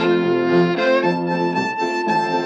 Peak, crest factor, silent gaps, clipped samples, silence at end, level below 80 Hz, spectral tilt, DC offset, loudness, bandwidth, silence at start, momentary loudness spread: -4 dBFS; 14 dB; none; under 0.1%; 0 s; -74 dBFS; -6.5 dB/octave; under 0.1%; -18 LUFS; 8.4 kHz; 0 s; 4 LU